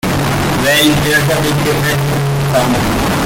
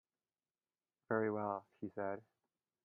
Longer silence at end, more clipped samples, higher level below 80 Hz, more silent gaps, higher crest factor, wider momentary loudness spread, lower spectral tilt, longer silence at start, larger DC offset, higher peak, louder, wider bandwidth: second, 0 s vs 0.65 s; neither; first, -30 dBFS vs -86 dBFS; neither; second, 12 dB vs 22 dB; second, 5 LU vs 10 LU; second, -4.5 dB/octave vs -10.5 dB/octave; second, 0.05 s vs 1.1 s; neither; first, 0 dBFS vs -22 dBFS; first, -12 LUFS vs -42 LUFS; first, 17 kHz vs 3.1 kHz